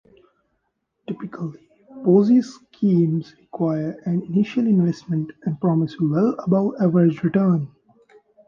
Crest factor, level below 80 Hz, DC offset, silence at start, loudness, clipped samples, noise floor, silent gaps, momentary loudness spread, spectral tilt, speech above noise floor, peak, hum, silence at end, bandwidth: 16 dB; -64 dBFS; under 0.1%; 1.1 s; -20 LUFS; under 0.1%; -74 dBFS; none; 15 LU; -9.5 dB/octave; 54 dB; -6 dBFS; none; 0.8 s; 7 kHz